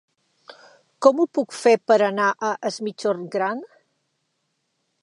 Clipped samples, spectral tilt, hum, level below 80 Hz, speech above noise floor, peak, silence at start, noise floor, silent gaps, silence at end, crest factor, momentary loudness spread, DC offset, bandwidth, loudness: under 0.1%; -4.5 dB/octave; none; -80 dBFS; 53 dB; -2 dBFS; 1 s; -74 dBFS; none; 1.35 s; 22 dB; 9 LU; under 0.1%; 11.5 kHz; -21 LUFS